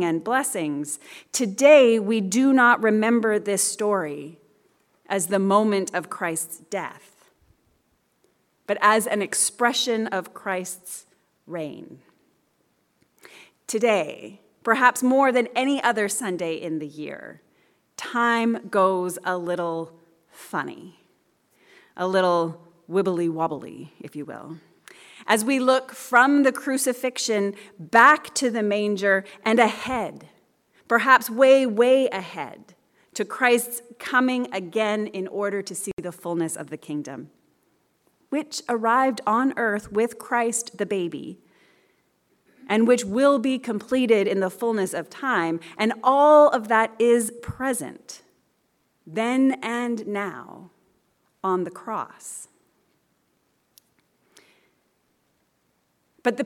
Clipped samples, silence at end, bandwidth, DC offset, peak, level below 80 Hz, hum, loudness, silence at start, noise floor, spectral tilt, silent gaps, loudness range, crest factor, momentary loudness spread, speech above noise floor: under 0.1%; 0 s; 17.5 kHz; under 0.1%; -4 dBFS; -68 dBFS; none; -22 LUFS; 0 s; -70 dBFS; -3.5 dB/octave; 35.93-35.97 s; 10 LU; 20 dB; 18 LU; 47 dB